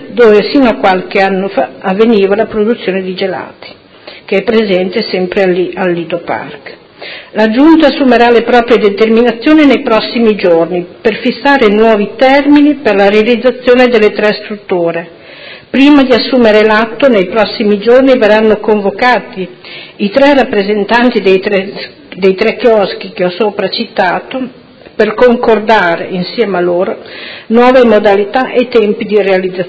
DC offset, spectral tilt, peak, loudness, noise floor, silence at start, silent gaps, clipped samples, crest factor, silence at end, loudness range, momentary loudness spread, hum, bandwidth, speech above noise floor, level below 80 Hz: under 0.1%; -7 dB/octave; 0 dBFS; -9 LUFS; -33 dBFS; 0 s; none; 2%; 8 dB; 0 s; 5 LU; 13 LU; none; 8 kHz; 25 dB; -44 dBFS